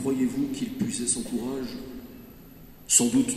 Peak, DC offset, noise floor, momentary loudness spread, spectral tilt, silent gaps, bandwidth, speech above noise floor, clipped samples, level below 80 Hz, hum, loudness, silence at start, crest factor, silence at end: -4 dBFS; under 0.1%; -47 dBFS; 24 LU; -3 dB/octave; none; 13.5 kHz; 21 dB; under 0.1%; -54 dBFS; none; -25 LUFS; 0 s; 22 dB; 0 s